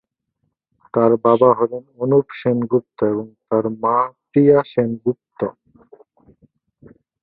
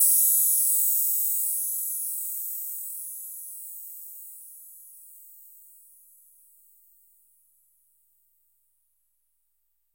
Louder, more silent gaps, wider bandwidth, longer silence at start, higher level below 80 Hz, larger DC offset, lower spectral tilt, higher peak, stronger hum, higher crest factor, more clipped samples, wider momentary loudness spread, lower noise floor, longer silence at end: first, -18 LUFS vs -23 LUFS; neither; second, 4.6 kHz vs 16.5 kHz; first, 0.95 s vs 0 s; first, -60 dBFS vs under -90 dBFS; neither; first, -12.5 dB/octave vs 7 dB/octave; first, -2 dBFS vs -8 dBFS; neither; about the same, 18 dB vs 22 dB; neither; second, 12 LU vs 27 LU; second, -72 dBFS vs -76 dBFS; second, 1.7 s vs 4.45 s